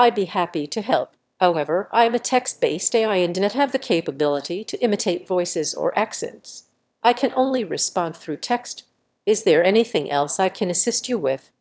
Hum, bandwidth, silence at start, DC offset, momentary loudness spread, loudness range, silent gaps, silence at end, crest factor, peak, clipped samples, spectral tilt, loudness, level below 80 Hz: none; 8 kHz; 0 s; under 0.1%; 9 LU; 3 LU; none; 0.25 s; 18 dB; -2 dBFS; under 0.1%; -3.5 dB/octave; -21 LUFS; -74 dBFS